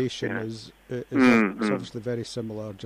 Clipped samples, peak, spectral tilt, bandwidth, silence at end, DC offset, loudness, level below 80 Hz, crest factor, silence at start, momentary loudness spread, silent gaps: under 0.1%; -10 dBFS; -6 dB/octave; 11.5 kHz; 0 s; under 0.1%; -25 LUFS; -60 dBFS; 16 dB; 0 s; 17 LU; none